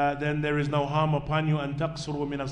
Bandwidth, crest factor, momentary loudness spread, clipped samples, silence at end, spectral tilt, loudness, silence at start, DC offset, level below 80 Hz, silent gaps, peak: 9.6 kHz; 14 dB; 6 LU; under 0.1%; 0 s; -7 dB/octave; -28 LUFS; 0 s; under 0.1%; -48 dBFS; none; -14 dBFS